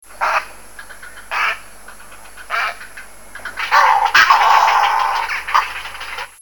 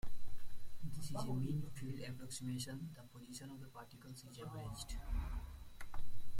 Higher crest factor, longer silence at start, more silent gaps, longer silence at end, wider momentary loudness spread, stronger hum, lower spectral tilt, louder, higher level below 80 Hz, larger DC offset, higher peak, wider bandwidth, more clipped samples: first, 18 dB vs 12 dB; about the same, 0 s vs 0.05 s; neither; about the same, 0 s vs 0 s; first, 25 LU vs 14 LU; neither; second, 0.5 dB/octave vs -5.5 dB/octave; first, -15 LUFS vs -48 LUFS; about the same, -50 dBFS vs -50 dBFS; first, 1% vs under 0.1%; first, 0 dBFS vs -26 dBFS; first, 19 kHz vs 16 kHz; neither